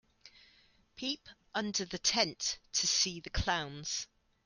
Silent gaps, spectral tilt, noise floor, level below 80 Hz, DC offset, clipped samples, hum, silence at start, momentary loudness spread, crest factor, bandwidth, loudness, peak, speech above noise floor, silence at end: none; -1.5 dB/octave; -67 dBFS; -52 dBFS; under 0.1%; under 0.1%; none; 0.25 s; 10 LU; 24 dB; 11.5 kHz; -33 LUFS; -14 dBFS; 31 dB; 0.4 s